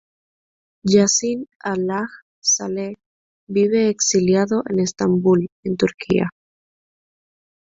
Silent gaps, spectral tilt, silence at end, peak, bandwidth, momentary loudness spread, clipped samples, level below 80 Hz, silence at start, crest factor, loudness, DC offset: 1.56-1.60 s, 2.22-2.42 s, 3.06-3.47 s, 5.52-5.63 s; -4.5 dB/octave; 1.4 s; -2 dBFS; 8 kHz; 11 LU; under 0.1%; -56 dBFS; 0.85 s; 18 dB; -19 LUFS; under 0.1%